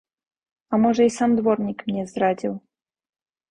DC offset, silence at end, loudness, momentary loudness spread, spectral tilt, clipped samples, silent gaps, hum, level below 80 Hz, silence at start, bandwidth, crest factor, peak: under 0.1%; 0.95 s; -22 LUFS; 9 LU; -6.5 dB/octave; under 0.1%; none; none; -60 dBFS; 0.7 s; 10.5 kHz; 16 dB; -6 dBFS